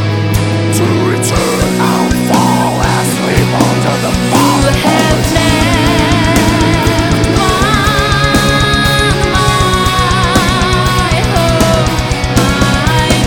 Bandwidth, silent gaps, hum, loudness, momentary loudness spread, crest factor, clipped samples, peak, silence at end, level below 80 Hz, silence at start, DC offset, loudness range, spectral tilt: 20 kHz; none; none; -10 LUFS; 2 LU; 10 dB; under 0.1%; 0 dBFS; 0 s; -20 dBFS; 0 s; under 0.1%; 1 LU; -4.5 dB/octave